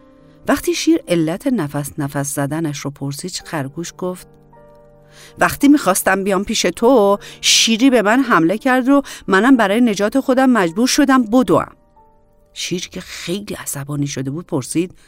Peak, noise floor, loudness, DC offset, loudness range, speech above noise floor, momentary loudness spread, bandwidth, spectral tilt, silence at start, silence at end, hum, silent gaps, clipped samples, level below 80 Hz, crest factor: -2 dBFS; -51 dBFS; -16 LUFS; under 0.1%; 10 LU; 35 dB; 13 LU; 16.5 kHz; -4 dB/octave; 0.45 s; 0.2 s; none; none; under 0.1%; -48 dBFS; 14 dB